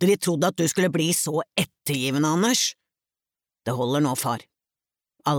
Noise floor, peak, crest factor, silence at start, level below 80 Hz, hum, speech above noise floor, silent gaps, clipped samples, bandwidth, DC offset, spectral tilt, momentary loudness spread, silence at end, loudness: under -90 dBFS; -8 dBFS; 16 dB; 0 s; -68 dBFS; none; over 67 dB; none; under 0.1%; over 20 kHz; under 0.1%; -4 dB/octave; 8 LU; 0 s; -23 LUFS